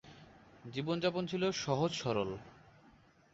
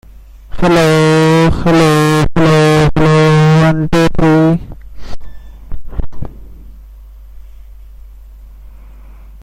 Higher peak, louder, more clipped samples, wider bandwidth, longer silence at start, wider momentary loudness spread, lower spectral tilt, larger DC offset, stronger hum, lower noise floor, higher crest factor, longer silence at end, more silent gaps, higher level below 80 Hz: second, -18 dBFS vs 0 dBFS; second, -36 LUFS vs -10 LUFS; neither; second, 8 kHz vs 14.5 kHz; second, 0.05 s vs 0.35 s; second, 14 LU vs 19 LU; second, -4.5 dB/octave vs -6.5 dB/octave; neither; neither; first, -64 dBFS vs -35 dBFS; first, 20 dB vs 12 dB; first, 0.75 s vs 0.05 s; neither; second, -66 dBFS vs -26 dBFS